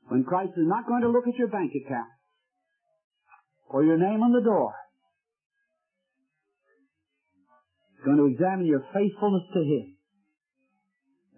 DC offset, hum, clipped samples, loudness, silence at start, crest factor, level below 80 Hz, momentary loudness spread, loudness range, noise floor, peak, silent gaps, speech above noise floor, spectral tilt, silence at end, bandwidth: under 0.1%; none; under 0.1%; -25 LUFS; 0.1 s; 16 dB; -78 dBFS; 10 LU; 3 LU; -81 dBFS; -12 dBFS; 3.04-3.10 s, 5.46-5.50 s; 57 dB; -12 dB/octave; 1.5 s; 3.3 kHz